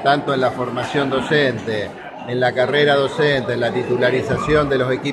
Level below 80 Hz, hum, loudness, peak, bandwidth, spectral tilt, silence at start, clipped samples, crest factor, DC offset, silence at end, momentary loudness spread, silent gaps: -44 dBFS; none; -18 LUFS; -2 dBFS; 12 kHz; -6 dB/octave; 0 s; under 0.1%; 16 dB; under 0.1%; 0 s; 8 LU; none